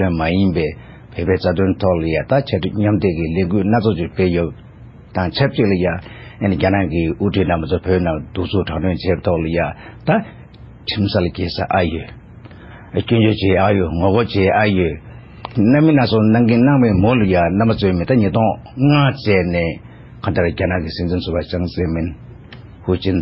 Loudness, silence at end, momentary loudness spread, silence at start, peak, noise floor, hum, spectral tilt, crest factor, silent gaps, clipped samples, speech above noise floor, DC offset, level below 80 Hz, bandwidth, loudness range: -17 LUFS; 0 s; 11 LU; 0 s; -2 dBFS; -39 dBFS; none; -11.5 dB/octave; 16 dB; none; under 0.1%; 23 dB; under 0.1%; -32 dBFS; 5.8 kHz; 6 LU